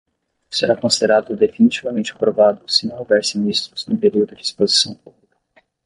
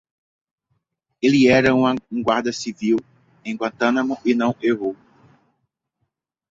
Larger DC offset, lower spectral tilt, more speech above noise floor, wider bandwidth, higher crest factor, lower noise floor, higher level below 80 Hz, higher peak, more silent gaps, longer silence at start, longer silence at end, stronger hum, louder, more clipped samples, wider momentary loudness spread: neither; second, -3.5 dB/octave vs -5.5 dB/octave; second, 41 dB vs 57 dB; first, 11.5 kHz vs 7.8 kHz; about the same, 16 dB vs 18 dB; second, -58 dBFS vs -76 dBFS; about the same, -60 dBFS vs -56 dBFS; about the same, -2 dBFS vs -2 dBFS; neither; second, 0.5 s vs 1.2 s; second, 0.9 s vs 1.55 s; neither; first, -17 LUFS vs -20 LUFS; neither; second, 7 LU vs 13 LU